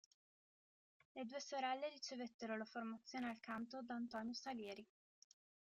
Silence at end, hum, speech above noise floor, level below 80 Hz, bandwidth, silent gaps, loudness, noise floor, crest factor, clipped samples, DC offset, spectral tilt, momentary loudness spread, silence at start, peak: 0.85 s; none; over 42 dB; -90 dBFS; 8 kHz; 2.34-2.39 s; -49 LUFS; under -90 dBFS; 18 dB; under 0.1%; under 0.1%; -3.5 dB/octave; 7 LU; 1.15 s; -32 dBFS